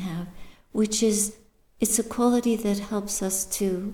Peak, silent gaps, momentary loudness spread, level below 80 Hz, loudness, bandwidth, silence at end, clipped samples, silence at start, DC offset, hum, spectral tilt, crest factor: -6 dBFS; none; 10 LU; -50 dBFS; -25 LUFS; 19.5 kHz; 0 s; under 0.1%; 0 s; under 0.1%; none; -4 dB/octave; 20 dB